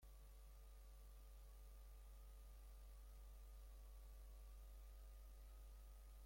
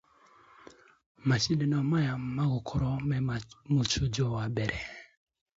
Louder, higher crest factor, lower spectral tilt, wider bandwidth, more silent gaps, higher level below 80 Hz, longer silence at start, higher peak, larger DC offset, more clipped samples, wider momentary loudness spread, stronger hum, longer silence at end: second, -64 LUFS vs -30 LUFS; second, 8 dB vs 18 dB; about the same, -4.5 dB/octave vs -5.5 dB/octave; first, 16.5 kHz vs 7.8 kHz; neither; second, -60 dBFS vs -50 dBFS; second, 0 s vs 1.25 s; second, -52 dBFS vs -14 dBFS; neither; neither; second, 2 LU vs 8 LU; neither; second, 0 s vs 0.55 s